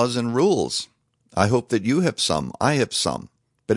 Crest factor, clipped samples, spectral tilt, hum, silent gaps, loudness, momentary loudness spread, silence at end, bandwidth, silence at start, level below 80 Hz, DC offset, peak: 20 dB; under 0.1%; -4.5 dB/octave; none; none; -22 LUFS; 10 LU; 0 s; 11.5 kHz; 0 s; -54 dBFS; under 0.1%; -2 dBFS